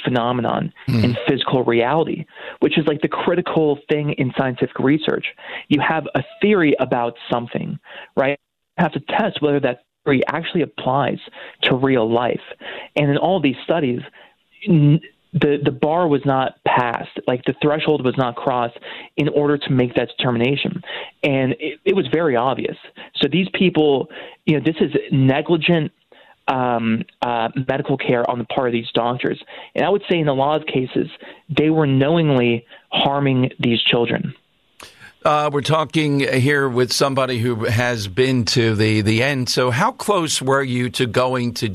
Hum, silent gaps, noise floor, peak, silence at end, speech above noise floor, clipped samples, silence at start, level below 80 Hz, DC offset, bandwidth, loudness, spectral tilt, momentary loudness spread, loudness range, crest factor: none; none; -45 dBFS; -4 dBFS; 0 s; 27 dB; under 0.1%; 0 s; -54 dBFS; under 0.1%; 14 kHz; -19 LUFS; -6 dB/octave; 8 LU; 3 LU; 14 dB